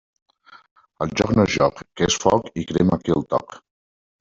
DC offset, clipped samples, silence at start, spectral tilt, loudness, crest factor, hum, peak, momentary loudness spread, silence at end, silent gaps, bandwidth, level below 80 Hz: under 0.1%; under 0.1%; 1 s; -5 dB/octave; -21 LUFS; 20 dB; none; -2 dBFS; 8 LU; 0.65 s; none; 7.8 kHz; -48 dBFS